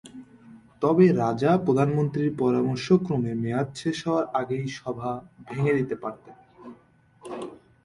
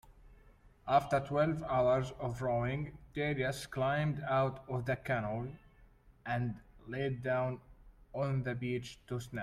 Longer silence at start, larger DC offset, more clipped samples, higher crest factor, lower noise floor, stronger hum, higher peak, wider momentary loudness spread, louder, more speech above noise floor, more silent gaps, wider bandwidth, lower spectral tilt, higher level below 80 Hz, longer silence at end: about the same, 0.05 s vs 0.05 s; neither; neither; about the same, 18 dB vs 20 dB; second, -58 dBFS vs -62 dBFS; neither; first, -8 dBFS vs -16 dBFS; first, 17 LU vs 11 LU; first, -25 LUFS vs -35 LUFS; first, 34 dB vs 28 dB; neither; second, 11.5 kHz vs 14 kHz; about the same, -7.5 dB/octave vs -7 dB/octave; about the same, -60 dBFS vs -58 dBFS; first, 0.3 s vs 0 s